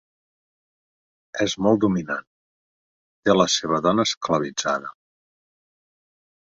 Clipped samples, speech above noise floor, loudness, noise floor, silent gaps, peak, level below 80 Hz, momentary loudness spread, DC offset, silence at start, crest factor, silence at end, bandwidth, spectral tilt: under 0.1%; over 69 dB; -22 LUFS; under -90 dBFS; 2.27-3.23 s, 4.17-4.21 s; -4 dBFS; -58 dBFS; 11 LU; under 0.1%; 1.35 s; 22 dB; 1.6 s; 8.2 kHz; -4 dB/octave